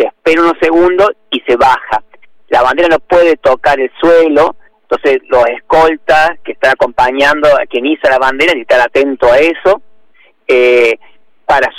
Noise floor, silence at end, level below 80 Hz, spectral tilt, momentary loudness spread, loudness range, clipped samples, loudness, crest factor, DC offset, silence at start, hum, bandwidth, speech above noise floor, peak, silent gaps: -46 dBFS; 0 s; -38 dBFS; -4.5 dB/octave; 6 LU; 1 LU; under 0.1%; -10 LUFS; 10 dB; under 0.1%; 0 s; none; 13.5 kHz; 37 dB; 0 dBFS; none